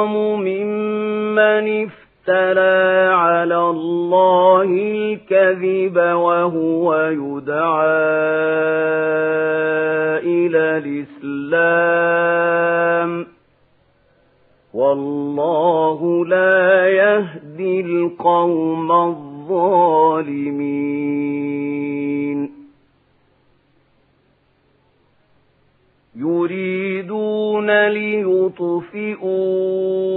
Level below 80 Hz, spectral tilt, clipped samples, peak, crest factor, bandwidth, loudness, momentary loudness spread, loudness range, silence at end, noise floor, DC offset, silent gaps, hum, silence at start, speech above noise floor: -68 dBFS; -10 dB/octave; under 0.1%; 0 dBFS; 16 dB; 4.1 kHz; -17 LUFS; 9 LU; 9 LU; 0 s; -59 dBFS; under 0.1%; none; none; 0 s; 43 dB